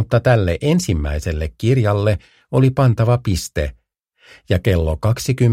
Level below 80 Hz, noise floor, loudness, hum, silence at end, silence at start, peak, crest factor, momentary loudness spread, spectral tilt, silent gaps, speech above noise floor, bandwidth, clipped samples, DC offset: -30 dBFS; -56 dBFS; -18 LUFS; none; 0 s; 0 s; 0 dBFS; 16 dB; 8 LU; -6.5 dB/octave; none; 40 dB; 15.5 kHz; under 0.1%; under 0.1%